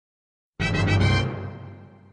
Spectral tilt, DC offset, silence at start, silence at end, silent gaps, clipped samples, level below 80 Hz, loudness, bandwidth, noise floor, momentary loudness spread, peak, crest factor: -6 dB/octave; under 0.1%; 0.6 s; 0.25 s; none; under 0.1%; -38 dBFS; -23 LUFS; 9.8 kHz; -43 dBFS; 20 LU; -10 dBFS; 16 dB